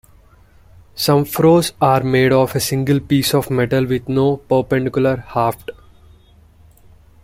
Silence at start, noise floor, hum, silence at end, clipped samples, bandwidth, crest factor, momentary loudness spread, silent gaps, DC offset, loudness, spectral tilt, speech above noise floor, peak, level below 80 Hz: 0.95 s; -48 dBFS; 50 Hz at -45 dBFS; 1.55 s; under 0.1%; 16.5 kHz; 16 dB; 6 LU; none; under 0.1%; -16 LUFS; -6 dB/octave; 32 dB; -2 dBFS; -46 dBFS